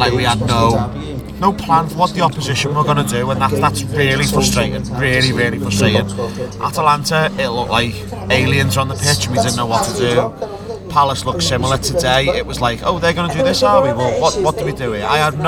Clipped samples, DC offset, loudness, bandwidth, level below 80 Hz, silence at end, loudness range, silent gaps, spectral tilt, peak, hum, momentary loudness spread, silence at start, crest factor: under 0.1%; under 0.1%; -15 LUFS; 19.5 kHz; -34 dBFS; 0 s; 1 LU; none; -4.5 dB/octave; 0 dBFS; none; 7 LU; 0 s; 16 dB